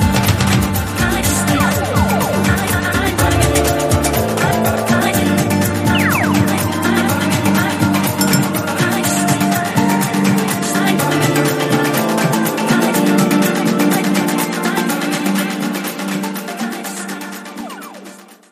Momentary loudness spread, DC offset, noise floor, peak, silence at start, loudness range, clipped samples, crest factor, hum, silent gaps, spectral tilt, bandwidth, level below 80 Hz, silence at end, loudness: 8 LU; under 0.1%; -38 dBFS; 0 dBFS; 0 s; 4 LU; under 0.1%; 16 dB; none; none; -4.5 dB/octave; 15.5 kHz; -34 dBFS; 0.25 s; -15 LUFS